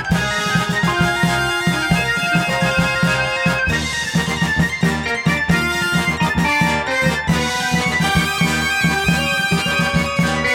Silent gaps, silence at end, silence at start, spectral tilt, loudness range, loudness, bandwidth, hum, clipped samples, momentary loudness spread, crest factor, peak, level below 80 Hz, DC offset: none; 0 s; 0 s; -4.5 dB/octave; 1 LU; -17 LUFS; 17 kHz; none; under 0.1%; 2 LU; 16 dB; -2 dBFS; -34 dBFS; under 0.1%